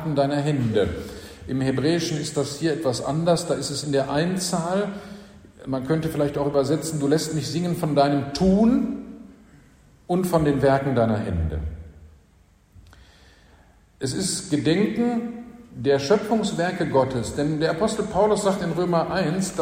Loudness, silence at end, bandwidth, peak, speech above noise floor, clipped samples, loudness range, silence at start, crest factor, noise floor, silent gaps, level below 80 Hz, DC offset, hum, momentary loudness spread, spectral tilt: -23 LUFS; 0 s; 16 kHz; -6 dBFS; 34 dB; under 0.1%; 4 LU; 0 s; 18 dB; -56 dBFS; none; -44 dBFS; under 0.1%; none; 11 LU; -5.5 dB/octave